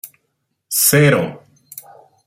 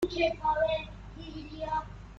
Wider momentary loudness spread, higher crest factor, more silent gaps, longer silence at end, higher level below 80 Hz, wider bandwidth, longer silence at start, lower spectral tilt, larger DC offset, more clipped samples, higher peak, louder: first, 25 LU vs 16 LU; about the same, 18 dB vs 18 dB; neither; first, 0.45 s vs 0 s; second, -56 dBFS vs -48 dBFS; first, 16.5 kHz vs 9.4 kHz; about the same, 0.05 s vs 0 s; second, -4 dB/octave vs -6 dB/octave; neither; neither; first, 0 dBFS vs -16 dBFS; first, -14 LUFS vs -31 LUFS